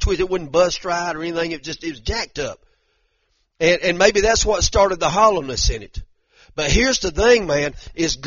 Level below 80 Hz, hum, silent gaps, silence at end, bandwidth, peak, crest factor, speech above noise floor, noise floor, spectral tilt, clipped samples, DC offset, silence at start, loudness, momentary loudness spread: -30 dBFS; none; none; 0 s; 7.4 kHz; 0 dBFS; 18 dB; 48 dB; -67 dBFS; -3 dB/octave; under 0.1%; under 0.1%; 0 s; -18 LUFS; 13 LU